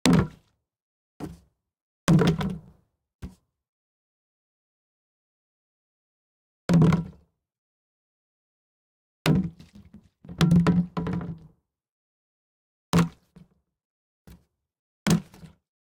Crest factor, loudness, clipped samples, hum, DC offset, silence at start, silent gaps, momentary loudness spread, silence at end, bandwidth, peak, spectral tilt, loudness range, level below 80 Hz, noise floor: 28 dB; -24 LUFS; under 0.1%; none; under 0.1%; 0.05 s; 0.82-1.20 s, 1.81-2.07 s, 3.15-3.19 s, 3.69-6.69 s, 7.58-9.25 s, 11.89-12.93 s, 13.85-14.25 s, 14.79-15.06 s; 22 LU; 0.35 s; 16.5 kHz; 0 dBFS; -6.5 dB/octave; 6 LU; -50 dBFS; -64 dBFS